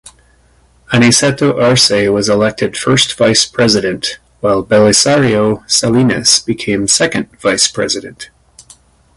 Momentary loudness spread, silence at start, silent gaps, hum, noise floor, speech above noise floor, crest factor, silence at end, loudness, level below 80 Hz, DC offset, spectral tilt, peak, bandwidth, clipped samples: 8 LU; 0.05 s; none; none; -50 dBFS; 38 dB; 12 dB; 0.55 s; -11 LUFS; -44 dBFS; under 0.1%; -3.5 dB/octave; 0 dBFS; 11.5 kHz; under 0.1%